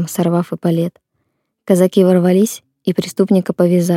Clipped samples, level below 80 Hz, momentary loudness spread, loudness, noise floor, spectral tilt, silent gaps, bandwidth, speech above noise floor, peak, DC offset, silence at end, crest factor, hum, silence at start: under 0.1%; -62 dBFS; 8 LU; -15 LUFS; -69 dBFS; -7 dB/octave; none; 16 kHz; 55 dB; 0 dBFS; under 0.1%; 0 s; 14 dB; none; 0 s